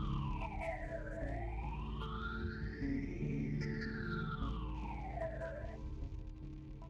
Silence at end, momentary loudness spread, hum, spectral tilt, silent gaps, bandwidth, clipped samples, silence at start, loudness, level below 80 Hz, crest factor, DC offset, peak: 0 s; 7 LU; none; -8 dB/octave; none; 7.8 kHz; under 0.1%; 0 s; -43 LUFS; -46 dBFS; 14 dB; under 0.1%; -28 dBFS